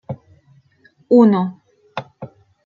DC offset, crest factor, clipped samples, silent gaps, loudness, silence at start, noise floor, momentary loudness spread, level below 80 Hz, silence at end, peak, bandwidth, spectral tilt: under 0.1%; 18 dB; under 0.1%; none; -15 LUFS; 0.1 s; -55 dBFS; 26 LU; -66 dBFS; 0.4 s; -2 dBFS; 5.2 kHz; -9.5 dB/octave